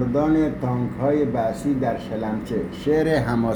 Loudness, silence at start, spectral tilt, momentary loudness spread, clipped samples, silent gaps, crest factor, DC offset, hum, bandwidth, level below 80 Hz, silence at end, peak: -22 LUFS; 0 s; -8 dB/octave; 7 LU; under 0.1%; none; 14 dB; under 0.1%; none; 20 kHz; -42 dBFS; 0 s; -8 dBFS